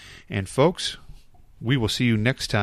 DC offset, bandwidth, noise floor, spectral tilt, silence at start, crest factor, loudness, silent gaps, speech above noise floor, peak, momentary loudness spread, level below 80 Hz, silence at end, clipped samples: under 0.1%; 14 kHz; -47 dBFS; -5.5 dB/octave; 0 s; 18 dB; -24 LUFS; none; 25 dB; -6 dBFS; 11 LU; -46 dBFS; 0 s; under 0.1%